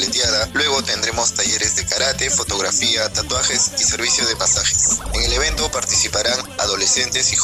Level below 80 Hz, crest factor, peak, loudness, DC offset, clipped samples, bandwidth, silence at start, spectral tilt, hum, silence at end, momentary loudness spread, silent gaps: -34 dBFS; 12 dB; -6 dBFS; -16 LUFS; under 0.1%; under 0.1%; 16 kHz; 0 s; -0.5 dB/octave; none; 0 s; 3 LU; none